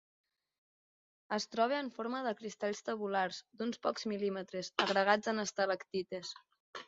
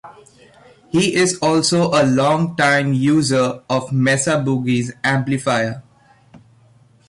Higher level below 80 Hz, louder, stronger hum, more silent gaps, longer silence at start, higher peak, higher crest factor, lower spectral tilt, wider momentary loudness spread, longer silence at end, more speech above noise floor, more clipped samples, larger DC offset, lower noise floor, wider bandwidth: second, -82 dBFS vs -56 dBFS; second, -36 LUFS vs -17 LUFS; neither; first, 6.60-6.73 s vs none; first, 1.3 s vs 0.05 s; second, -14 dBFS vs -6 dBFS; first, 24 dB vs 12 dB; second, -2 dB/octave vs -5 dB/octave; first, 10 LU vs 5 LU; second, 0.05 s vs 1.3 s; first, over 54 dB vs 35 dB; neither; neither; first, under -90 dBFS vs -52 dBFS; second, 7.6 kHz vs 11.5 kHz